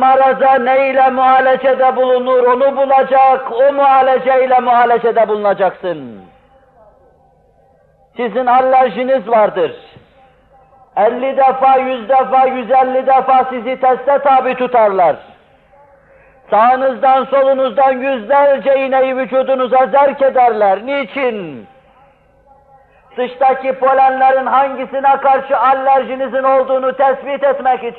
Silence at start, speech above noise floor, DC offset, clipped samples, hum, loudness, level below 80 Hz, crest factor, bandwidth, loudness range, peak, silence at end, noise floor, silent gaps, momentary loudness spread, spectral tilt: 0 s; 39 dB; under 0.1%; under 0.1%; none; -12 LUFS; -58 dBFS; 10 dB; 4.4 kHz; 6 LU; -2 dBFS; 0 s; -51 dBFS; none; 7 LU; -7.5 dB/octave